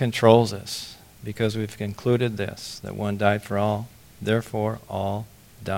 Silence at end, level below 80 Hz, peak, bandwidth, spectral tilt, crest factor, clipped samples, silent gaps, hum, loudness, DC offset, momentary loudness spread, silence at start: 0 s; -56 dBFS; 0 dBFS; 17 kHz; -6 dB/octave; 24 dB; under 0.1%; none; none; -25 LUFS; under 0.1%; 18 LU; 0 s